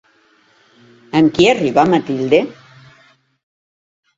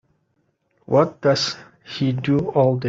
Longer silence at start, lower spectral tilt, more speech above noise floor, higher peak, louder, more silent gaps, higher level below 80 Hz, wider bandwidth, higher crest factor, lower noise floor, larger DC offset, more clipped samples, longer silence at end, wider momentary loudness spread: first, 1.15 s vs 0.9 s; about the same, -6 dB/octave vs -6 dB/octave; second, 41 dB vs 49 dB; first, 0 dBFS vs -4 dBFS; first, -14 LUFS vs -20 LUFS; neither; about the same, -54 dBFS vs -58 dBFS; about the same, 7.8 kHz vs 7.8 kHz; about the same, 18 dB vs 18 dB; second, -54 dBFS vs -68 dBFS; neither; neither; first, 1.65 s vs 0 s; second, 6 LU vs 9 LU